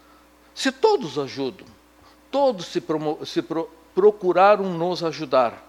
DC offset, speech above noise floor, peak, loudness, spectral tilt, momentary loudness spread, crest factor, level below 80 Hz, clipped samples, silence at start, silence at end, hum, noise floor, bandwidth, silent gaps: under 0.1%; 32 dB; -4 dBFS; -22 LUFS; -5 dB/octave; 12 LU; 18 dB; -64 dBFS; under 0.1%; 0.55 s; 0.1 s; none; -53 dBFS; 13 kHz; none